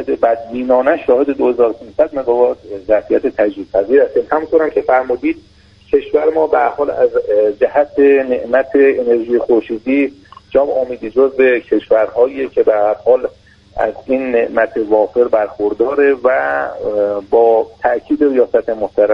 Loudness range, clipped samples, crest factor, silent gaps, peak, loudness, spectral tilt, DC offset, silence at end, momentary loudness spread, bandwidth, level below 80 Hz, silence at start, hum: 2 LU; under 0.1%; 14 dB; none; 0 dBFS; -14 LUFS; -7.5 dB/octave; under 0.1%; 0 s; 6 LU; 5.4 kHz; -48 dBFS; 0 s; none